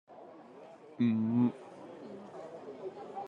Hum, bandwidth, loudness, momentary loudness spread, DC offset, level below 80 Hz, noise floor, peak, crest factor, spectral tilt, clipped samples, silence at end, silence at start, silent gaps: none; 5.2 kHz; -33 LUFS; 23 LU; under 0.1%; -88 dBFS; -53 dBFS; -20 dBFS; 16 dB; -9 dB/octave; under 0.1%; 0 s; 0.1 s; none